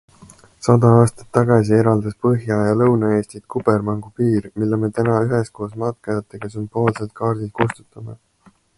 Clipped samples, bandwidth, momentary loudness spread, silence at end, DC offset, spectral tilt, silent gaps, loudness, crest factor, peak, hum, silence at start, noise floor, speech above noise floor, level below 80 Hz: under 0.1%; 11.5 kHz; 12 LU; 0.65 s; under 0.1%; -8 dB/octave; none; -19 LUFS; 18 dB; 0 dBFS; none; 0.6 s; -54 dBFS; 37 dB; -50 dBFS